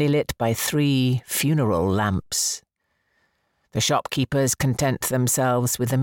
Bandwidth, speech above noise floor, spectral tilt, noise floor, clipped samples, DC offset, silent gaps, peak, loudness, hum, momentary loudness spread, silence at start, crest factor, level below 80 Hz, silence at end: 17 kHz; 50 dB; -4.5 dB/octave; -72 dBFS; under 0.1%; under 0.1%; none; -8 dBFS; -22 LUFS; none; 4 LU; 0 s; 14 dB; -48 dBFS; 0 s